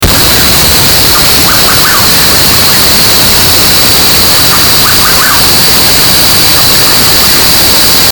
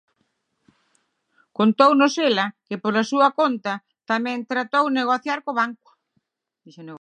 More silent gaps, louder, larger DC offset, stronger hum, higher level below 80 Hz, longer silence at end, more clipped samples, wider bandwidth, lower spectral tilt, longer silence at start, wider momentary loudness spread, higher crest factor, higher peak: neither; first, -2 LUFS vs -21 LUFS; first, 1% vs under 0.1%; neither; first, -22 dBFS vs -78 dBFS; about the same, 0 s vs 0.05 s; first, 9% vs under 0.1%; first, over 20 kHz vs 9.4 kHz; second, -1.5 dB/octave vs -4.5 dB/octave; second, 0 s vs 1.6 s; second, 1 LU vs 12 LU; second, 4 dB vs 20 dB; about the same, 0 dBFS vs -2 dBFS